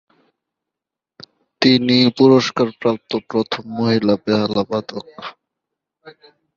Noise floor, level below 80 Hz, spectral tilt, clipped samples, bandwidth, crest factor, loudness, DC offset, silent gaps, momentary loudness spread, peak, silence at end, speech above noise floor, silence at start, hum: -85 dBFS; -58 dBFS; -6 dB/octave; under 0.1%; 7.2 kHz; 18 dB; -17 LUFS; under 0.1%; none; 18 LU; 0 dBFS; 0.45 s; 68 dB; 1.6 s; none